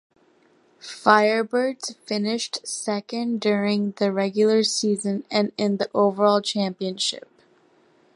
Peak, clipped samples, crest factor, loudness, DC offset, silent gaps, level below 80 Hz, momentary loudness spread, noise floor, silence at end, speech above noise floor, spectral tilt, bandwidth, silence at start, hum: -2 dBFS; under 0.1%; 22 dB; -22 LUFS; under 0.1%; none; -74 dBFS; 9 LU; -60 dBFS; 0.95 s; 37 dB; -4 dB/octave; 11.5 kHz; 0.85 s; none